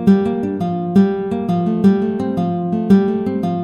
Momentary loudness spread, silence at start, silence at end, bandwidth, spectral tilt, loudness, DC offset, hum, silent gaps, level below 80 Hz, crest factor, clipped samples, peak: 6 LU; 0 s; 0 s; 6.8 kHz; -9.5 dB/octave; -17 LUFS; under 0.1%; none; none; -52 dBFS; 14 dB; under 0.1%; -2 dBFS